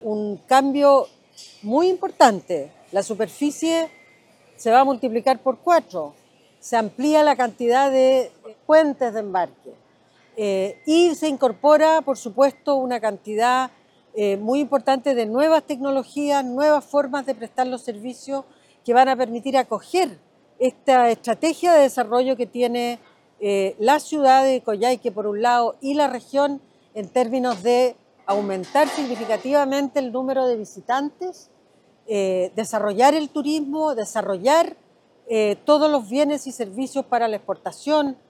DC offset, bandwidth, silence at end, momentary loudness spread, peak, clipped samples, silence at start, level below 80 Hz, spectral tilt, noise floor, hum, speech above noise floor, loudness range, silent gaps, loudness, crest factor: under 0.1%; 15 kHz; 0.15 s; 12 LU; 0 dBFS; under 0.1%; 0 s; -76 dBFS; -4 dB/octave; -57 dBFS; none; 38 dB; 3 LU; none; -20 LUFS; 20 dB